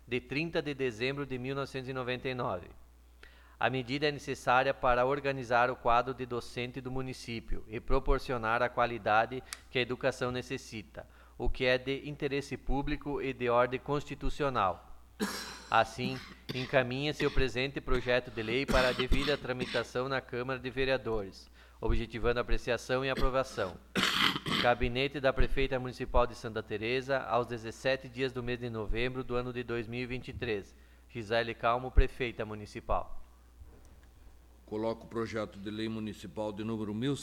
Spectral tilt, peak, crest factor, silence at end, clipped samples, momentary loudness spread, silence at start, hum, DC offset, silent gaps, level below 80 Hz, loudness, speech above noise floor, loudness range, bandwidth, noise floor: -5 dB/octave; -10 dBFS; 24 dB; 0 s; under 0.1%; 11 LU; 0.05 s; none; under 0.1%; none; -40 dBFS; -33 LUFS; 24 dB; 6 LU; 15 kHz; -56 dBFS